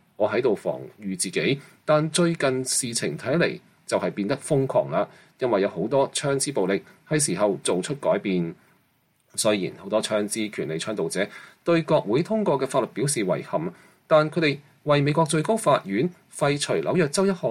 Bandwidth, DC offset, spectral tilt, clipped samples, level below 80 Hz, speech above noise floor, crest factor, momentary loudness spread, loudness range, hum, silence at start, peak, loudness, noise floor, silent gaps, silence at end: 16 kHz; under 0.1%; -4.5 dB/octave; under 0.1%; -66 dBFS; 42 dB; 16 dB; 8 LU; 3 LU; none; 0.2 s; -8 dBFS; -24 LUFS; -66 dBFS; none; 0 s